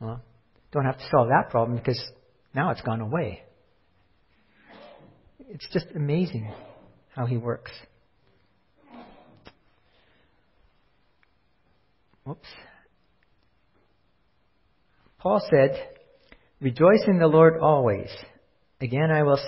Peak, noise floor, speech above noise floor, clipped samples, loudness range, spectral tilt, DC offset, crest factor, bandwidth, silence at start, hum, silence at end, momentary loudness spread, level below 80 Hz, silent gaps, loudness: -4 dBFS; -69 dBFS; 46 dB; under 0.1%; 15 LU; -11 dB/octave; under 0.1%; 22 dB; 5.8 kHz; 0 s; none; 0 s; 24 LU; -58 dBFS; none; -23 LUFS